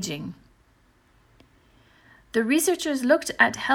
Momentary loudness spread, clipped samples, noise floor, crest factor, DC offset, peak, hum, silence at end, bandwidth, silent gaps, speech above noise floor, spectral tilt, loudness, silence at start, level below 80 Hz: 13 LU; under 0.1%; -61 dBFS; 22 dB; under 0.1%; -4 dBFS; none; 0 s; 17 kHz; none; 38 dB; -3 dB/octave; -23 LUFS; 0 s; -62 dBFS